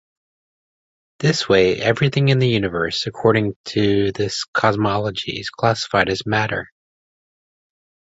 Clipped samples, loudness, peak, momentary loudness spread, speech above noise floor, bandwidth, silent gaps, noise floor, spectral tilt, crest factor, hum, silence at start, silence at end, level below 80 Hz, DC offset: under 0.1%; -19 LUFS; -2 dBFS; 7 LU; over 71 dB; 8 kHz; 3.56-3.64 s, 4.48-4.53 s; under -90 dBFS; -5.5 dB/octave; 18 dB; none; 1.2 s; 1.35 s; -48 dBFS; under 0.1%